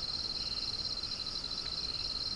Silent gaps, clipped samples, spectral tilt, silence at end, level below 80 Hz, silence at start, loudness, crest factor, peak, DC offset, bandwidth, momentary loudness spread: none; under 0.1%; -2 dB/octave; 0 s; -52 dBFS; 0 s; -35 LUFS; 12 dB; -26 dBFS; under 0.1%; 10.5 kHz; 2 LU